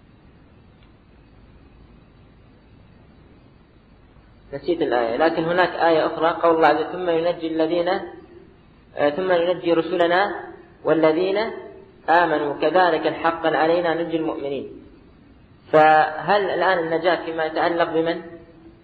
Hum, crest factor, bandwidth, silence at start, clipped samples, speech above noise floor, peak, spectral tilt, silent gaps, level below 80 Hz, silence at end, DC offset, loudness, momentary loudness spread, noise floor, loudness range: none; 18 dB; 4.8 kHz; 4.5 s; under 0.1%; 32 dB; -4 dBFS; -7.5 dB/octave; none; -56 dBFS; 0.15 s; under 0.1%; -20 LUFS; 12 LU; -51 dBFS; 3 LU